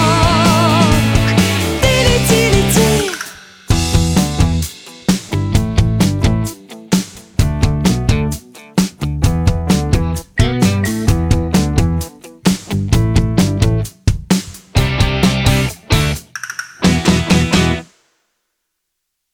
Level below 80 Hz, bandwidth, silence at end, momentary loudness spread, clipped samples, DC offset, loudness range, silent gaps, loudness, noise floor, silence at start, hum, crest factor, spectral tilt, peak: -24 dBFS; 20 kHz; 1.5 s; 9 LU; under 0.1%; under 0.1%; 4 LU; none; -15 LUFS; -74 dBFS; 0 s; none; 14 dB; -5 dB/octave; 0 dBFS